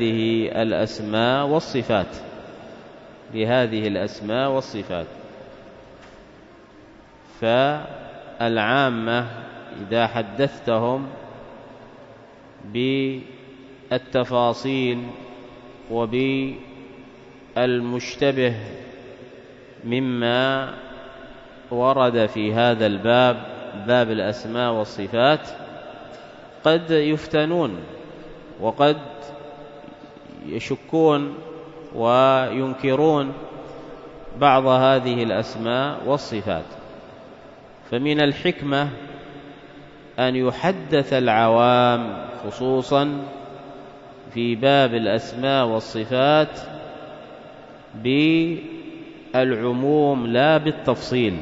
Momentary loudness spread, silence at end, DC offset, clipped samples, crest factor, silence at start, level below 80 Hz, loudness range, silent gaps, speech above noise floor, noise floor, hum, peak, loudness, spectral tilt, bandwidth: 23 LU; 0 s; under 0.1%; under 0.1%; 20 dB; 0 s; -56 dBFS; 6 LU; none; 27 dB; -47 dBFS; none; -2 dBFS; -21 LUFS; -6.5 dB/octave; 7.8 kHz